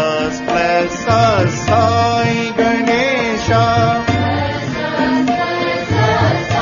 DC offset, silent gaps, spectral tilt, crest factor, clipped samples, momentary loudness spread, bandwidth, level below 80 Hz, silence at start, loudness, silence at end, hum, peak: under 0.1%; none; -5.5 dB/octave; 14 dB; under 0.1%; 5 LU; 7.4 kHz; -38 dBFS; 0 s; -15 LUFS; 0 s; none; 0 dBFS